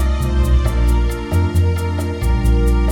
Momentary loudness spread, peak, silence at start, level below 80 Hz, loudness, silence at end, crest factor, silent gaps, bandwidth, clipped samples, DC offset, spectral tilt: 4 LU; -4 dBFS; 0 s; -16 dBFS; -17 LUFS; 0 s; 10 dB; none; 16 kHz; under 0.1%; 0.4%; -7 dB/octave